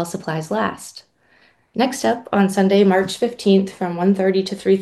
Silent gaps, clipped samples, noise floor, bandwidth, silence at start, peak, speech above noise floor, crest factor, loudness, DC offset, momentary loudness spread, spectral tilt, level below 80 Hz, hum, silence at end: none; under 0.1%; -56 dBFS; 12.5 kHz; 0 s; -2 dBFS; 38 dB; 16 dB; -18 LUFS; under 0.1%; 10 LU; -6 dB/octave; -62 dBFS; none; 0 s